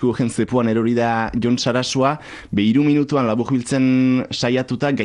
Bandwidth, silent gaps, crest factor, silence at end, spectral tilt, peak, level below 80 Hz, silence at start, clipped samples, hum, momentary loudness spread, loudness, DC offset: 11 kHz; none; 12 dB; 0 s; -6 dB/octave; -6 dBFS; -48 dBFS; 0 s; under 0.1%; none; 5 LU; -18 LUFS; under 0.1%